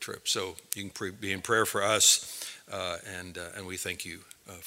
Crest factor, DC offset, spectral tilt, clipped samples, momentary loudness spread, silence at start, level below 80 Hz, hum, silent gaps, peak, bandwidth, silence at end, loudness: 28 dB; under 0.1%; -1 dB/octave; under 0.1%; 19 LU; 0 s; -70 dBFS; none; none; -2 dBFS; 16.5 kHz; 0 s; -28 LUFS